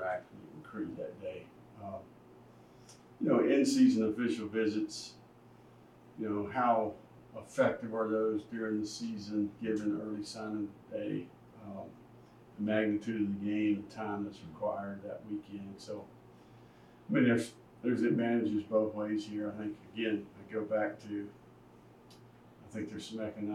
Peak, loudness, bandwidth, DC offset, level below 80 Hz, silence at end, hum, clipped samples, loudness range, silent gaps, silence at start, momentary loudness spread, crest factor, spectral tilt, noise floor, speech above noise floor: -16 dBFS; -34 LUFS; 12.5 kHz; under 0.1%; -72 dBFS; 0 s; none; under 0.1%; 8 LU; none; 0 s; 18 LU; 20 dB; -6 dB/octave; -58 dBFS; 25 dB